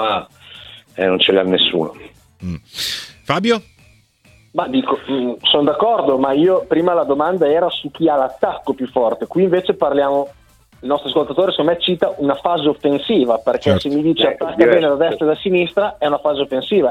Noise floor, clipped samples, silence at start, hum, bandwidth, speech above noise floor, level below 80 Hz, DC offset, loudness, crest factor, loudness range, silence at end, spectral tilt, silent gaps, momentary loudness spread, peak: -51 dBFS; under 0.1%; 0 s; none; 15.5 kHz; 35 dB; -52 dBFS; under 0.1%; -16 LUFS; 16 dB; 4 LU; 0 s; -5.5 dB/octave; none; 10 LU; 0 dBFS